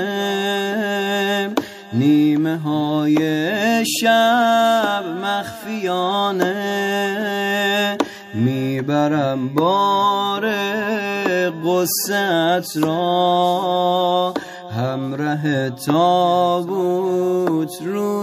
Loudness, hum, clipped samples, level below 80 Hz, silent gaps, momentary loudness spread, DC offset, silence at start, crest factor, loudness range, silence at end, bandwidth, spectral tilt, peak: -19 LUFS; none; under 0.1%; -68 dBFS; none; 8 LU; under 0.1%; 0 s; 16 dB; 3 LU; 0 s; 15.5 kHz; -5 dB/octave; -2 dBFS